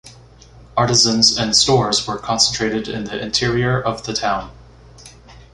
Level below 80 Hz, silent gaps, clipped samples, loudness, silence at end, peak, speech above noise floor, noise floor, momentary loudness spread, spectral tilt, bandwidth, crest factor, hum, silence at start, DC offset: -44 dBFS; none; under 0.1%; -16 LUFS; 0.15 s; 0 dBFS; 26 dB; -44 dBFS; 12 LU; -3 dB/octave; 11.5 kHz; 20 dB; none; 0.05 s; under 0.1%